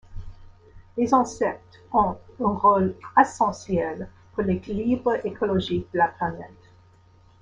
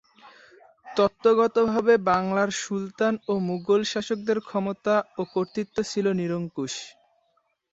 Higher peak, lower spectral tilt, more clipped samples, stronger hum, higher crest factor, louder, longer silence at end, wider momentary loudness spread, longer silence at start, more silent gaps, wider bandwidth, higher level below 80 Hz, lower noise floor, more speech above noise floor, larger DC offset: first, -4 dBFS vs -8 dBFS; first, -6.5 dB/octave vs -5 dB/octave; neither; neither; about the same, 22 dB vs 18 dB; about the same, -24 LUFS vs -25 LUFS; first, 0.95 s vs 0.8 s; first, 17 LU vs 10 LU; second, 0.1 s vs 0.25 s; neither; first, 9.8 kHz vs 8 kHz; first, -48 dBFS vs -64 dBFS; second, -55 dBFS vs -71 dBFS; second, 31 dB vs 46 dB; neither